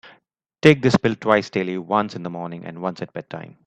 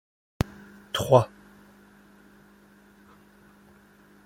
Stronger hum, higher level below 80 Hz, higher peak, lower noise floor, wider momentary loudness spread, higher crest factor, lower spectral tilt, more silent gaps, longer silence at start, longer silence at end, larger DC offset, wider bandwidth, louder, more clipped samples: neither; about the same, -56 dBFS vs -52 dBFS; first, 0 dBFS vs -4 dBFS; first, -62 dBFS vs -56 dBFS; first, 17 LU vs 14 LU; about the same, 22 dB vs 26 dB; about the same, -6.5 dB/octave vs -6 dB/octave; neither; second, 0.05 s vs 0.95 s; second, 0.2 s vs 3 s; neither; second, 10 kHz vs 16.5 kHz; first, -20 LUFS vs -25 LUFS; neither